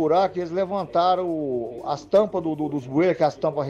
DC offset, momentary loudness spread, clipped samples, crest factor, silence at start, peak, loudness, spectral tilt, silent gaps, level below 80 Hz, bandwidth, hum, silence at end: under 0.1%; 7 LU; under 0.1%; 14 dB; 0 s; -8 dBFS; -23 LUFS; -7 dB/octave; none; -58 dBFS; 7.8 kHz; none; 0 s